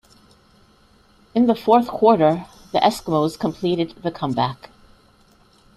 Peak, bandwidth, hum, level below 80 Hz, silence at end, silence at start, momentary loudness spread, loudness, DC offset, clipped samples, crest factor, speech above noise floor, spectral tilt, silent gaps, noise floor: -2 dBFS; 13.5 kHz; none; -54 dBFS; 1.2 s; 1.35 s; 11 LU; -20 LUFS; under 0.1%; under 0.1%; 20 dB; 36 dB; -6.5 dB/octave; none; -55 dBFS